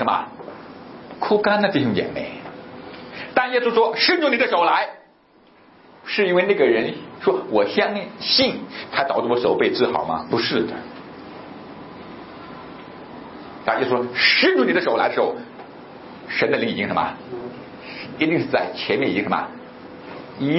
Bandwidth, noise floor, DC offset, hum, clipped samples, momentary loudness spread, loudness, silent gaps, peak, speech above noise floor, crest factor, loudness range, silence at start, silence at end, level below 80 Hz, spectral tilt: 6 kHz; -54 dBFS; under 0.1%; none; under 0.1%; 21 LU; -20 LUFS; none; -2 dBFS; 34 dB; 20 dB; 5 LU; 0 s; 0 s; -60 dBFS; -8 dB/octave